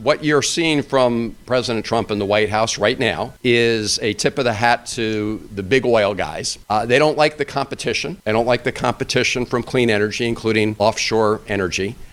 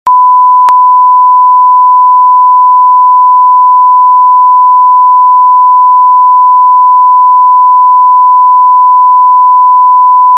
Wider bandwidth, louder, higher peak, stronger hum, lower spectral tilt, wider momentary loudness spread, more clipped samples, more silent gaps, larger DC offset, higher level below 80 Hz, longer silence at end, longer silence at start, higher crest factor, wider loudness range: first, 15.5 kHz vs 2.3 kHz; second, -18 LUFS vs -3 LUFS; about the same, 0 dBFS vs 0 dBFS; neither; first, -4 dB/octave vs -1.5 dB/octave; first, 6 LU vs 0 LU; second, under 0.1% vs 0.5%; neither; neither; first, -44 dBFS vs -72 dBFS; about the same, 0.05 s vs 0 s; about the same, 0 s vs 0.05 s; first, 18 dB vs 4 dB; about the same, 1 LU vs 0 LU